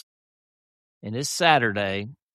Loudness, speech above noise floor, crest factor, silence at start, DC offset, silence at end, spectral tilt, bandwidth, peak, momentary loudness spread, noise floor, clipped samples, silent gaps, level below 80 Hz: -23 LUFS; over 67 dB; 22 dB; 1.05 s; under 0.1%; 0.2 s; -3.5 dB/octave; 13.5 kHz; -4 dBFS; 15 LU; under -90 dBFS; under 0.1%; none; -68 dBFS